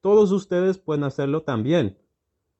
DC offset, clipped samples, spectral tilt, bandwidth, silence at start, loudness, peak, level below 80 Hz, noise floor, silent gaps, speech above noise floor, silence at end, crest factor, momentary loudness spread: under 0.1%; under 0.1%; -7.5 dB/octave; 8.2 kHz; 0.05 s; -22 LUFS; -8 dBFS; -62 dBFS; -77 dBFS; none; 56 dB; 0.7 s; 14 dB; 7 LU